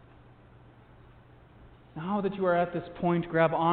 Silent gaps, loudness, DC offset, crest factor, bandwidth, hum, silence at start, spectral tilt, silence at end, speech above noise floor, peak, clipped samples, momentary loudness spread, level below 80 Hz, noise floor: none; -29 LUFS; under 0.1%; 20 dB; 4.4 kHz; none; 1.6 s; -11 dB/octave; 0 s; 27 dB; -12 dBFS; under 0.1%; 10 LU; -60 dBFS; -55 dBFS